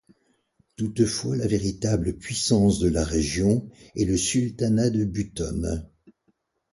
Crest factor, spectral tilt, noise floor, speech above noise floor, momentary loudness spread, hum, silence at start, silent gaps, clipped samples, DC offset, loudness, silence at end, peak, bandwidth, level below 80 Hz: 18 dB; -5.5 dB/octave; -70 dBFS; 47 dB; 9 LU; none; 0.8 s; none; under 0.1%; under 0.1%; -24 LUFS; 0.85 s; -8 dBFS; 11.5 kHz; -40 dBFS